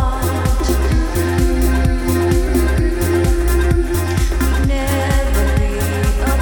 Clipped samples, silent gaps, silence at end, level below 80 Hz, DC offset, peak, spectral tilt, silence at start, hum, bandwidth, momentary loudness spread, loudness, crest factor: under 0.1%; none; 0 s; -18 dBFS; 0.1%; -2 dBFS; -6 dB/octave; 0 s; none; over 20 kHz; 2 LU; -17 LUFS; 12 dB